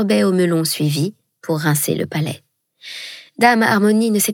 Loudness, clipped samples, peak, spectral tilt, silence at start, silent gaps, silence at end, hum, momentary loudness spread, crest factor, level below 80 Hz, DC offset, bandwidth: -17 LUFS; under 0.1%; 0 dBFS; -4.5 dB/octave; 0 s; none; 0 s; none; 17 LU; 18 dB; -68 dBFS; under 0.1%; 18.5 kHz